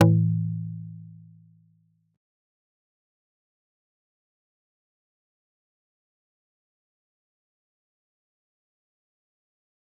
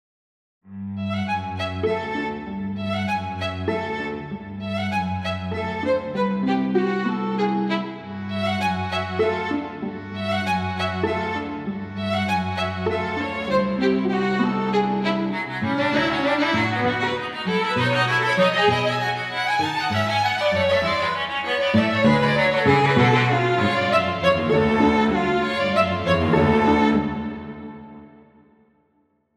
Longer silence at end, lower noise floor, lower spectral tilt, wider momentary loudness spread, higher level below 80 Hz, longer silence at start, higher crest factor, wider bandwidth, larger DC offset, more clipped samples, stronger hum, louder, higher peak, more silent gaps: first, 8.85 s vs 1.3 s; about the same, -66 dBFS vs -66 dBFS; first, -9 dB/octave vs -6 dB/octave; first, 24 LU vs 11 LU; second, -74 dBFS vs -50 dBFS; second, 0 s vs 0.65 s; first, 30 dB vs 18 dB; second, 3.8 kHz vs 13 kHz; neither; neither; neither; second, -26 LUFS vs -22 LUFS; about the same, -2 dBFS vs -4 dBFS; neither